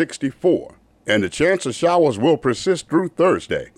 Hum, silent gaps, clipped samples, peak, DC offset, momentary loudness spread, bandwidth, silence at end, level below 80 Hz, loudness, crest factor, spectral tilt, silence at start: none; none; under 0.1%; -6 dBFS; under 0.1%; 6 LU; 12 kHz; 0.1 s; -52 dBFS; -19 LUFS; 12 dB; -5 dB/octave; 0 s